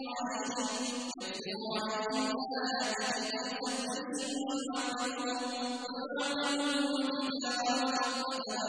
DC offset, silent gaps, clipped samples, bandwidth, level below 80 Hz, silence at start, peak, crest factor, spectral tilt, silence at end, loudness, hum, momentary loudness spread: under 0.1%; none; under 0.1%; 10.5 kHz; -76 dBFS; 0 s; -18 dBFS; 16 dB; -2 dB/octave; 0 s; -34 LUFS; none; 6 LU